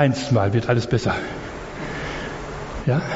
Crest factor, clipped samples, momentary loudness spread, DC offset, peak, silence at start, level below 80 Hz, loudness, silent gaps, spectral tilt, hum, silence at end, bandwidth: 18 dB; under 0.1%; 12 LU; under 0.1%; -4 dBFS; 0 s; -40 dBFS; -24 LUFS; none; -6 dB/octave; none; 0 s; 8 kHz